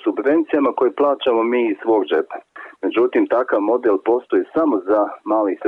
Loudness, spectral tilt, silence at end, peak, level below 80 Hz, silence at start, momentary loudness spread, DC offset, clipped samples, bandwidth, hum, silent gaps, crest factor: -18 LUFS; -7 dB/octave; 0 s; -8 dBFS; -66 dBFS; 0.05 s; 5 LU; under 0.1%; under 0.1%; 4 kHz; none; none; 10 dB